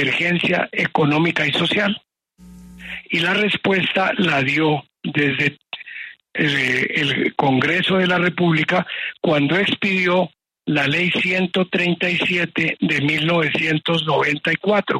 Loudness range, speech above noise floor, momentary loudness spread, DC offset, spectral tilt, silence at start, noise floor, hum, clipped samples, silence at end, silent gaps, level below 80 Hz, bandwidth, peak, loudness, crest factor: 2 LU; 27 dB; 8 LU; under 0.1%; -6 dB/octave; 0 s; -45 dBFS; none; under 0.1%; 0 s; none; -58 dBFS; 12.5 kHz; -4 dBFS; -18 LUFS; 16 dB